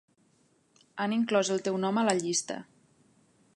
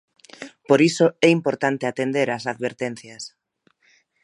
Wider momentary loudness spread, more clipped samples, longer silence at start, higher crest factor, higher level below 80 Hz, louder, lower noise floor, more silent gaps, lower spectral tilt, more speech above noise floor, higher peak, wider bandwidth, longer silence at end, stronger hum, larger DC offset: second, 13 LU vs 20 LU; neither; first, 0.95 s vs 0.4 s; about the same, 22 dB vs 22 dB; second, -78 dBFS vs -72 dBFS; second, -29 LUFS vs -21 LUFS; about the same, -68 dBFS vs -65 dBFS; neither; second, -4 dB/octave vs -5.5 dB/octave; second, 39 dB vs 44 dB; second, -10 dBFS vs -2 dBFS; about the same, 11.5 kHz vs 11.5 kHz; about the same, 0.9 s vs 0.95 s; neither; neither